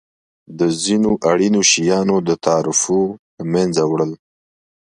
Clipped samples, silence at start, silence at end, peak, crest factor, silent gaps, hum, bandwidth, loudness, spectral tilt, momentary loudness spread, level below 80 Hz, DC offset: under 0.1%; 0.5 s; 0.75 s; 0 dBFS; 18 dB; 3.19-3.37 s; none; 11.5 kHz; -16 LUFS; -4 dB/octave; 8 LU; -54 dBFS; under 0.1%